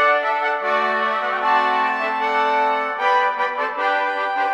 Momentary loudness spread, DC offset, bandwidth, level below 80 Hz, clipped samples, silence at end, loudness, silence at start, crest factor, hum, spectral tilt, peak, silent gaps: 4 LU; under 0.1%; 9.8 kHz; -76 dBFS; under 0.1%; 0 s; -19 LUFS; 0 s; 14 dB; none; -2.5 dB/octave; -6 dBFS; none